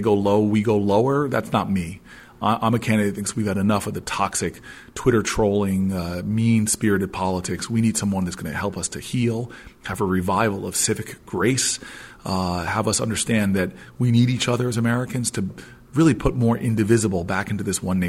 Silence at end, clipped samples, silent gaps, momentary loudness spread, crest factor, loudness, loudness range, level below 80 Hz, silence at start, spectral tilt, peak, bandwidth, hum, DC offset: 0 s; under 0.1%; none; 9 LU; 18 dB; -22 LUFS; 2 LU; -46 dBFS; 0 s; -5 dB/octave; -4 dBFS; 16 kHz; none; under 0.1%